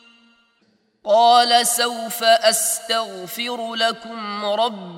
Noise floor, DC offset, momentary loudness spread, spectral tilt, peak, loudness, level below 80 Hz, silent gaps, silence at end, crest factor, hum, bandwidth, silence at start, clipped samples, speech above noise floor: -63 dBFS; under 0.1%; 13 LU; -0.5 dB/octave; -2 dBFS; -18 LUFS; -76 dBFS; none; 0 s; 18 dB; none; 17 kHz; 1.05 s; under 0.1%; 44 dB